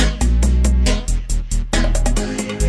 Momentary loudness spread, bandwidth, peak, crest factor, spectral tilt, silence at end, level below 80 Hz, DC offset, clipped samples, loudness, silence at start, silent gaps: 7 LU; 11 kHz; -2 dBFS; 14 dB; -5 dB/octave; 0 s; -16 dBFS; under 0.1%; under 0.1%; -19 LUFS; 0 s; none